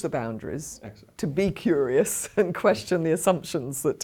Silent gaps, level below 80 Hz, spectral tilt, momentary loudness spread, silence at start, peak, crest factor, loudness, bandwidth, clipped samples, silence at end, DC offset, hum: none; -54 dBFS; -5 dB/octave; 12 LU; 0 s; -6 dBFS; 18 dB; -25 LUFS; 19 kHz; under 0.1%; 0 s; under 0.1%; none